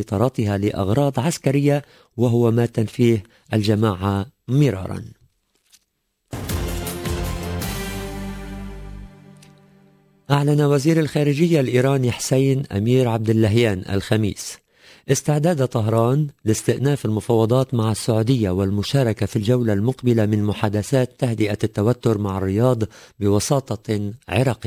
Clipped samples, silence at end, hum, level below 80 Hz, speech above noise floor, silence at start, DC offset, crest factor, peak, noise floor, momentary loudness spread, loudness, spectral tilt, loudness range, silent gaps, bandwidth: under 0.1%; 0 s; none; -40 dBFS; 52 dB; 0 s; under 0.1%; 16 dB; -4 dBFS; -71 dBFS; 11 LU; -20 LUFS; -6.5 dB/octave; 10 LU; none; 16 kHz